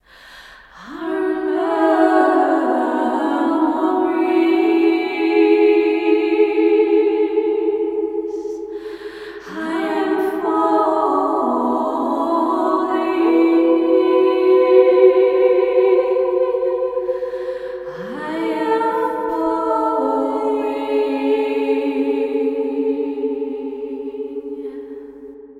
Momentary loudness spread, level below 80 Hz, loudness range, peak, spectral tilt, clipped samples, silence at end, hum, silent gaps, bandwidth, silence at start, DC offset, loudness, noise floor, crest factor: 14 LU; -58 dBFS; 7 LU; 0 dBFS; -5.5 dB/octave; under 0.1%; 0 s; none; none; 10.5 kHz; 0.25 s; under 0.1%; -17 LUFS; -42 dBFS; 16 dB